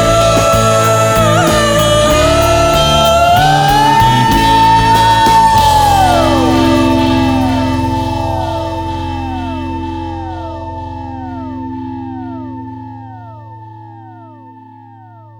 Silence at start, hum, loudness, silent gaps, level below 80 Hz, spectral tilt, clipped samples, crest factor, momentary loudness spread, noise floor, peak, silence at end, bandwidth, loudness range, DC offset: 0 s; none; -10 LUFS; none; -26 dBFS; -4.5 dB/octave; under 0.1%; 12 dB; 16 LU; -36 dBFS; 0 dBFS; 0.2 s; over 20 kHz; 17 LU; under 0.1%